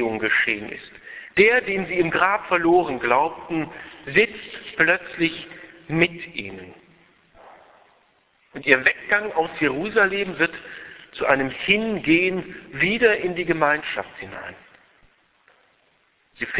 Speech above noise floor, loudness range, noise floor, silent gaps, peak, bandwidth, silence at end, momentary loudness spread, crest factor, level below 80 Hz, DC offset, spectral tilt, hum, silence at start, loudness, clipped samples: 42 dB; 6 LU; -63 dBFS; none; 0 dBFS; 4 kHz; 0 s; 19 LU; 22 dB; -56 dBFS; under 0.1%; -8.5 dB/octave; none; 0 s; -21 LUFS; under 0.1%